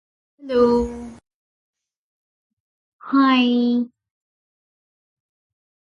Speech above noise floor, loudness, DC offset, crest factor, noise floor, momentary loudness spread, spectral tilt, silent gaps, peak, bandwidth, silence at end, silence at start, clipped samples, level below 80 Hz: over 73 dB; -19 LUFS; under 0.1%; 18 dB; under -90 dBFS; 17 LU; -6 dB/octave; 1.34-1.73 s, 1.96-2.99 s; -6 dBFS; 7.2 kHz; 1.95 s; 0.45 s; under 0.1%; -48 dBFS